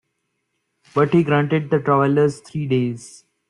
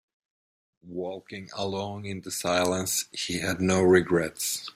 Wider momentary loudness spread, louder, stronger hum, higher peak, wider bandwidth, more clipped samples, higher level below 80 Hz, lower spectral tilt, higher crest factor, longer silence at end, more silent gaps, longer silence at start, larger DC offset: second, 10 LU vs 15 LU; first, -19 LUFS vs -27 LUFS; neither; first, -4 dBFS vs -8 dBFS; second, 11 kHz vs 16 kHz; neither; about the same, -58 dBFS vs -62 dBFS; first, -7.5 dB/octave vs -4 dB/octave; about the same, 16 dB vs 20 dB; first, 0.4 s vs 0.05 s; neither; about the same, 0.95 s vs 0.85 s; neither